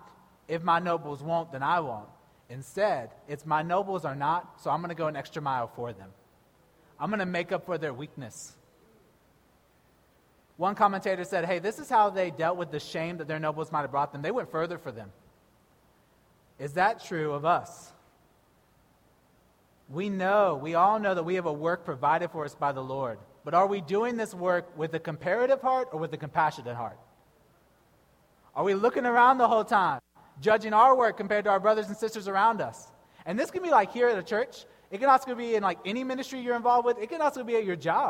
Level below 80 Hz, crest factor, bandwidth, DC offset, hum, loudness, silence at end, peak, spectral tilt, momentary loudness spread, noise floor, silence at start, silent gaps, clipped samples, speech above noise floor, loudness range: -70 dBFS; 20 dB; 16 kHz; under 0.1%; none; -28 LUFS; 0 s; -8 dBFS; -5.5 dB/octave; 14 LU; -64 dBFS; 0.5 s; none; under 0.1%; 36 dB; 9 LU